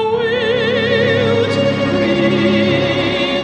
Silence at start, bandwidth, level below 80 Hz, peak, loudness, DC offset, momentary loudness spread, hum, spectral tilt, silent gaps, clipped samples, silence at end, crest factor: 0 s; 9.8 kHz; -44 dBFS; -2 dBFS; -14 LUFS; under 0.1%; 2 LU; none; -6 dB/octave; none; under 0.1%; 0 s; 14 dB